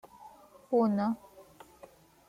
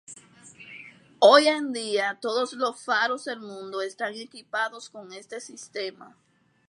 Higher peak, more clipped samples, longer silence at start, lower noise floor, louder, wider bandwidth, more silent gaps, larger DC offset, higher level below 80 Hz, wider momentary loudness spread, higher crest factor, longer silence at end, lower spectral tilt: second, -16 dBFS vs -2 dBFS; neither; about the same, 0.2 s vs 0.1 s; first, -57 dBFS vs -50 dBFS; second, -30 LUFS vs -25 LUFS; first, 15 kHz vs 11.5 kHz; neither; neither; first, -72 dBFS vs -84 dBFS; about the same, 26 LU vs 25 LU; second, 18 dB vs 24 dB; first, 0.85 s vs 0.6 s; first, -8.5 dB/octave vs -2 dB/octave